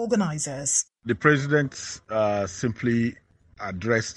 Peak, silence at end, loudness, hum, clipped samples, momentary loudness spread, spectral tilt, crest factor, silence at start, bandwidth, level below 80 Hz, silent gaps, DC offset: -2 dBFS; 0.05 s; -25 LUFS; none; under 0.1%; 10 LU; -4.5 dB/octave; 22 dB; 0 s; 11.5 kHz; -56 dBFS; none; under 0.1%